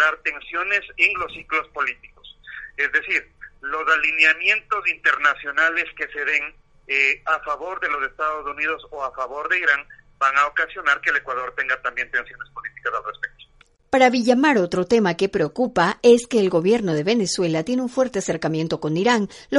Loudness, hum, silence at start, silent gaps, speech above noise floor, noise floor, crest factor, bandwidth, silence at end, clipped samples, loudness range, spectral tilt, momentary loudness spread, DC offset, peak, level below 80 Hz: -20 LUFS; none; 0 s; none; 33 dB; -54 dBFS; 18 dB; 11.5 kHz; 0 s; under 0.1%; 5 LU; -4.5 dB/octave; 11 LU; under 0.1%; -2 dBFS; -54 dBFS